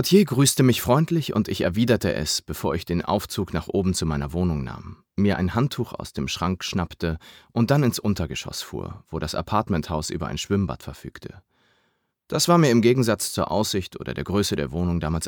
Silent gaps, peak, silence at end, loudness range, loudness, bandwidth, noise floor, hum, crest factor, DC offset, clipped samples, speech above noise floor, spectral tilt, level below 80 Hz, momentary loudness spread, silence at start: none; -4 dBFS; 0 s; 6 LU; -23 LUFS; over 20 kHz; -70 dBFS; none; 20 dB; under 0.1%; under 0.1%; 47 dB; -5 dB/octave; -42 dBFS; 13 LU; 0 s